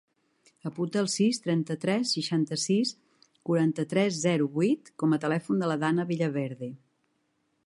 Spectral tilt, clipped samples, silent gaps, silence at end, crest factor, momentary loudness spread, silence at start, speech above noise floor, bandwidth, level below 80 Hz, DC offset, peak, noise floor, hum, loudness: -5.5 dB/octave; under 0.1%; none; 0.9 s; 16 dB; 8 LU; 0.65 s; 47 dB; 11.5 kHz; -76 dBFS; under 0.1%; -12 dBFS; -74 dBFS; none; -28 LUFS